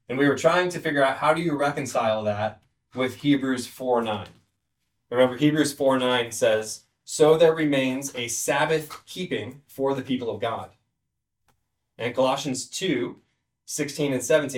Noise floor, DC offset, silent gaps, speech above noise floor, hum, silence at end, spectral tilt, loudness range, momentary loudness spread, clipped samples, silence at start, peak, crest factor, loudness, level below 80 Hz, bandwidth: -81 dBFS; under 0.1%; none; 57 dB; none; 0 s; -4.5 dB/octave; 7 LU; 13 LU; under 0.1%; 0.1 s; -6 dBFS; 18 dB; -24 LUFS; -66 dBFS; 17.5 kHz